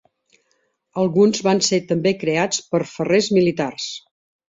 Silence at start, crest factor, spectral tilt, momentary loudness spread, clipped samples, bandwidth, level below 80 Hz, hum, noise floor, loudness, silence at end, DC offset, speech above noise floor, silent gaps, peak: 0.95 s; 16 dB; -4.5 dB/octave; 12 LU; under 0.1%; 8 kHz; -62 dBFS; none; -68 dBFS; -19 LUFS; 0.5 s; under 0.1%; 49 dB; none; -4 dBFS